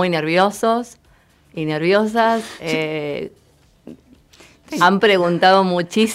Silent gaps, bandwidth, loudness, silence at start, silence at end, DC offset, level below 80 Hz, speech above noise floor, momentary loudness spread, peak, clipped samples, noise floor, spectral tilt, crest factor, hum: none; 16 kHz; -17 LUFS; 0 s; 0 s; under 0.1%; -58 dBFS; 37 dB; 15 LU; -2 dBFS; under 0.1%; -54 dBFS; -5 dB/octave; 18 dB; none